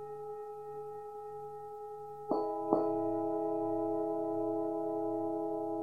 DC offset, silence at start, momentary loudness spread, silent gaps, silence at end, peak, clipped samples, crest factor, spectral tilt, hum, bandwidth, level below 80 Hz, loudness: 0.1%; 0 s; 13 LU; none; 0 s; -12 dBFS; under 0.1%; 24 dB; -9.5 dB/octave; none; 4.8 kHz; -72 dBFS; -36 LUFS